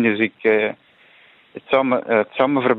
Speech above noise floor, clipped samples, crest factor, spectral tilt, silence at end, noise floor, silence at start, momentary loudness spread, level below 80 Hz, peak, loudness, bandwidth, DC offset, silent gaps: 33 dB; under 0.1%; 16 dB; -8.5 dB/octave; 0 s; -51 dBFS; 0 s; 21 LU; -66 dBFS; -4 dBFS; -19 LUFS; 4.2 kHz; under 0.1%; none